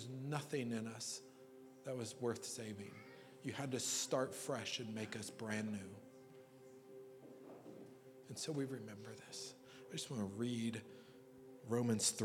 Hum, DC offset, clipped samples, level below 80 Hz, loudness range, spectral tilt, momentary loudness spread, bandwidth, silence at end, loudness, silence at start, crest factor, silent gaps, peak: none; under 0.1%; under 0.1%; -88 dBFS; 7 LU; -4 dB/octave; 21 LU; 17.5 kHz; 0 s; -44 LUFS; 0 s; 22 dB; none; -24 dBFS